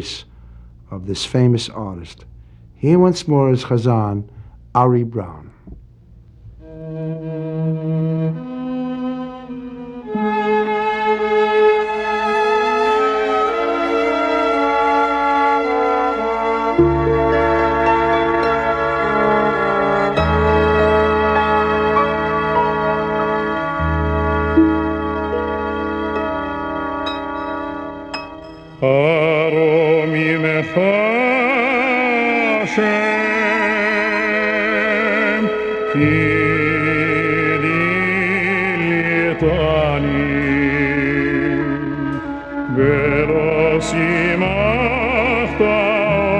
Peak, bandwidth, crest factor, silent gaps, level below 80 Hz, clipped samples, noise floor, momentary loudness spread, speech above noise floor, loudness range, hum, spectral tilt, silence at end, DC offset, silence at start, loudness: 0 dBFS; 10 kHz; 16 dB; none; -36 dBFS; under 0.1%; -44 dBFS; 10 LU; 27 dB; 7 LU; none; -6.5 dB/octave; 0 s; under 0.1%; 0 s; -17 LUFS